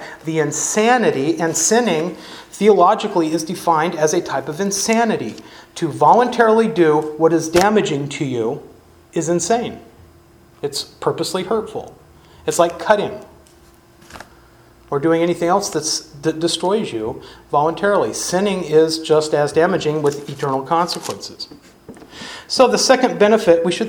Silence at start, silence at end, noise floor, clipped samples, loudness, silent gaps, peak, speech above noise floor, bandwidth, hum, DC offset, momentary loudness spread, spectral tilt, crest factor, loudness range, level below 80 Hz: 0 s; 0 s; -48 dBFS; under 0.1%; -17 LUFS; none; 0 dBFS; 31 dB; 19.5 kHz; none; under 0.1%; 14 LU; -4 dB/octave; 18 dB; 7 LU; -54 dBFS